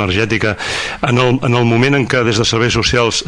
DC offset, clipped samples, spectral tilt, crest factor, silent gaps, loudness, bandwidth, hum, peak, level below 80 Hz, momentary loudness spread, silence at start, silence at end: under 0.1%; under 0.1%; -4.5 dB/octave; 12 dB; none; -13 LUFS; 10.5 kHz; none; 0 dBFS; -36 dBFS; 5 LU; 0 s; 0 s